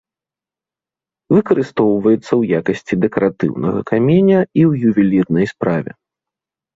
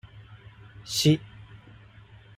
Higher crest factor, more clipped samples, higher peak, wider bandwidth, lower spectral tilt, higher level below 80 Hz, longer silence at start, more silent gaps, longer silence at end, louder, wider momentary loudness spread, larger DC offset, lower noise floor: second, 14 dB vs 22 dB; neither; first, -2 dBFS vs -8 dBFS; second, 7.8 kHz vs 16 kHz; first, -9 dB/octave vs -5 dB/octave; first, -52 dBFS vs -58 dBFS; first, 1.3 s vs 0.15 s; neither; second, 0.85 s vs 1.1 s; first, -15 LUFS vs -25 LUFS; second, 7 LU vs 27 LU; neither; first, -89 dBFS vs -51 dBFS